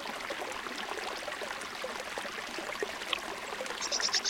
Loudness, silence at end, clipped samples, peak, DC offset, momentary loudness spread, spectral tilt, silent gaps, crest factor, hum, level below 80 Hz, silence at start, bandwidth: -36 LUFS; 0 s; under 0.1%; -12 dBFS; under 0.1%; 5 LU; 0 dB/octave; none; 24 dB; none; -66 dBFS; 0 s; 17 kHz